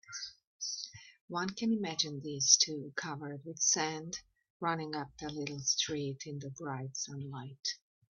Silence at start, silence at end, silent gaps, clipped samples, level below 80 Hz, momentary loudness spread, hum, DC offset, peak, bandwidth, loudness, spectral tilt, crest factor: 0.1 s; 0.35 s; 0.47-0.59 s, 1.21-1.28 s, 4.50-4.60 s; under 0.1%; -74 dBFS; 15 LU; none; under 0.1%; -8 dBFS; 7.6 kHz; -34 LUFS; -2 dB/octave; 28 dB